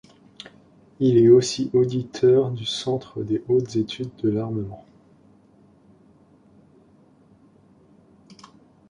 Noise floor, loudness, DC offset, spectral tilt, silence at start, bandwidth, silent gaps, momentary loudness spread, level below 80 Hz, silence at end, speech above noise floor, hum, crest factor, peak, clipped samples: -55 dBFS; -21 LUFS; under 0.1%; -6.5 dB/octave; 1 s; 10.5 kHz; none; 24 LU; -60 dBFS; 4.1 s; 35 dB; none; 20 dB; -4 dBFS; under 0.1%